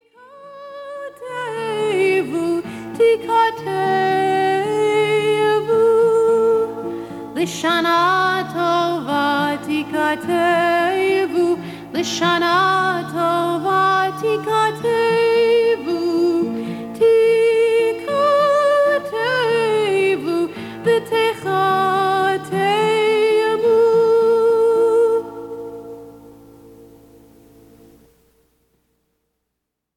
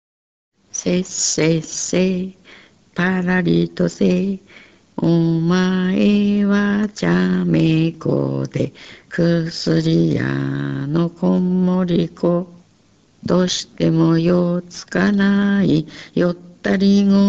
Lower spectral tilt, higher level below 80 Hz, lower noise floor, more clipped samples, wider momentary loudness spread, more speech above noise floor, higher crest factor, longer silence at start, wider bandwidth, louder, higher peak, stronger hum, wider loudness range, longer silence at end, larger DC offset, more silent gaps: about the same, -5 dB/octave vs -6 dB/octave; second, -60 dBFS vs -48 dBFS; first, -78 dBFS vs -55 dBFS; neither; about the same, 11 LU vs 9 LU; first, 61 dB vs 38 dB; about the same, 12 dB vs 14 dB; second, 0.3 s vs 0.75 s; first, 15 kHz vs 8.2 kHz; about the same, -17 LUFS vs -18 LUFS; about the same, -6 dBFS vs -4 dBFS; neither; about the same, 3 LU vs 3 LU; first, 3.1 s vs 0 s; neither; neither